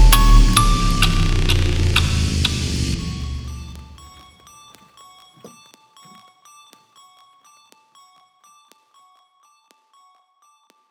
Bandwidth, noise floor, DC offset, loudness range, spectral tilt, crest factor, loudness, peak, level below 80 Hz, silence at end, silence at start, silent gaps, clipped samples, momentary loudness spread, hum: over 20 kHz; -59 dBFS; under 0.1%; 25 LU; -4 dB/octave; 20 dB; -18 LUFS; 0 dBFS; -22 dBFS; 5.45 s; 0 s; none; under 0.1%; 21 LU; none